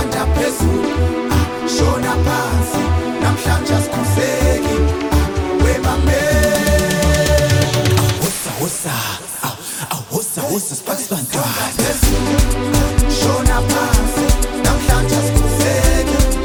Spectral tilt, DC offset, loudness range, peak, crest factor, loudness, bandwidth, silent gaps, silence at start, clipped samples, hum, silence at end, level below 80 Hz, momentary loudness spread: -4.5 dB/octave; under 0.1%; 4 LU; 0 dBFS; 14 dB; -16 LUFS; over 20 kHz; none; 0 s; under 0.1%; none; 0 s; -22 dBFS; 6 LU